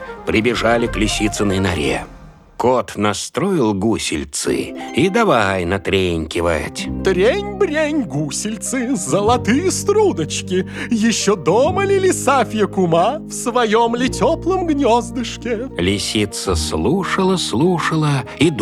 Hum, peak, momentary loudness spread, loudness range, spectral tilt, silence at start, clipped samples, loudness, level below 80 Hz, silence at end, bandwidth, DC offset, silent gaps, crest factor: none; -2 dBFS; 6 LU; 2 LU; -4.5 dB/octave; 0 s; under 0.1%; -17 LUFS; -36 dBFS; 0 s; 14.5 kHz; under 0.1%; none; 16 dB